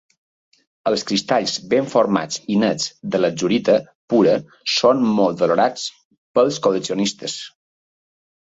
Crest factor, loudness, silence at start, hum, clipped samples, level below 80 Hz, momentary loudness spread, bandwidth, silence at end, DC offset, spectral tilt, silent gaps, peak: 18 dB; -19 LUFS; 0.85 s; none; under 0.1%; -62 dBFS; 8 LU; 8 kHz; 0.95 s; under 0.1%; -4.5 dB/octave; 3.95-4.08 s, 6.05-6.11 s, 6.18-6.34 s; -2 dBFS